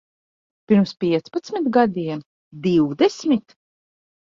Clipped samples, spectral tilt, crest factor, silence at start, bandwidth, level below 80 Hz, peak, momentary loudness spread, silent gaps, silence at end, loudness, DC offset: under 0.1%; -7 dB/octave; 18 dB; 0.7 s; 7.6 kHz; -62 dBFS; -4 dBFS; 9 LU; 2.26-2.51 s; 0.8 s; -20 LUFS; under 0.1%